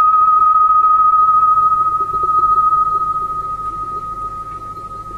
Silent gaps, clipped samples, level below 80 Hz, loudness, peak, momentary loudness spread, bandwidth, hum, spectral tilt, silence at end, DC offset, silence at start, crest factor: none; under 0.1%; -42 dBFS; -13 LUFS; -6 dBFS; 15 LU; 4.6 kHz; none; -6 dB/octave; 0 s; under 0.1%; 0 s; 8 dB